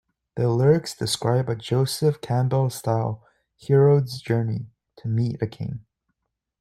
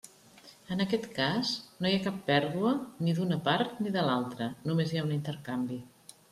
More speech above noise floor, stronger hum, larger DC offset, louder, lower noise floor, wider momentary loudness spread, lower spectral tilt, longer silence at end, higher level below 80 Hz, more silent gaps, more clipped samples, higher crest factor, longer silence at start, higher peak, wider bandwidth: first, 57 dB vs 25 dB; neither; neither; first, -23 LUFS vs -31 LUFS; first, -79 dBFS vs -56 dBFS; first, 16 LU vs 7 LU; about the same, -6.5 dB/octave vs -6 dB/octave; first, 0.8 s vs 0.45 s; first, -58 dBFS vs -68 dBFS; neither; neither; about the same, 18 dB vs 20 dB; first, 0.35 s vs 0.05 s; first, -6 dBFS vs -12 dBFS; about the same, 14 kHz vs 14.5 kHz